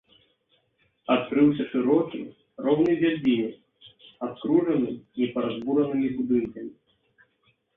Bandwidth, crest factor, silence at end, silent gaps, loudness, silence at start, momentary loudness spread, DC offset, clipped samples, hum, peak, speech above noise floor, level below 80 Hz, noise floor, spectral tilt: 4 kHz; 18 dB; 1.05 s; none; -25 LUFS; 1.1 s; 14 LU; under 0.1%; under 0.1%; none; -8 dBFS; 45 dB; -64 dBFS; -69 dBFS; -9 dB/octave